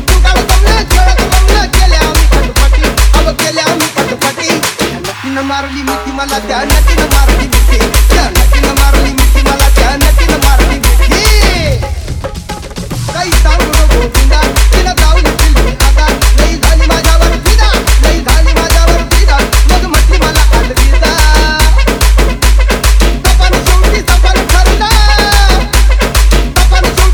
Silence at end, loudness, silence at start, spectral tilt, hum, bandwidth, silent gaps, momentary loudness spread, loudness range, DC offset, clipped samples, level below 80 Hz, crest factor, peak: 0 s; -9 LUFS; 0 s; -4 dB/octave; none; 19.5 kHz; none; 6 LU; 3 LU; under 0.1%; 0.2%; -8 dBFS; 6 dB; 0 dBFS